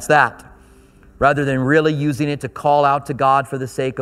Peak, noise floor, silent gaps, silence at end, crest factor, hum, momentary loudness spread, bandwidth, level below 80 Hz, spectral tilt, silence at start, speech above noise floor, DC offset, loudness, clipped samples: 0 dBFS; -47 dBFS; none; 0 s; 18 dB; none; 8 LU; 14.5 kHz; -46 dBFS; -6 dB/octave; 0 s; 30 dB; under 0.1%; -17 LUFS; under 0.1%